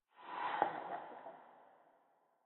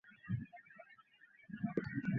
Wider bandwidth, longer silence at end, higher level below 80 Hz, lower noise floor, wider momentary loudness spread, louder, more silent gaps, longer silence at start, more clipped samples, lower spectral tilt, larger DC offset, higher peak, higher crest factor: second, 4 kHz vs 6 kHz; first, 0.7 s vs 0 s; second, under -90 dBFS vs -68 dBFS; first, -75 dBFS vs -66 dBFS; about the same, 20 LU vs 22 LU; about the same, -42 LUFS vs -44 LUFS; neither; about the same, 0.15 s vs 0.05 s; neither; second, -1.5 dB/octave vs -8.5 dB/octave; neither; first, -16 dBFS vs -20 dBFS; first, 28 dB vs 22 dB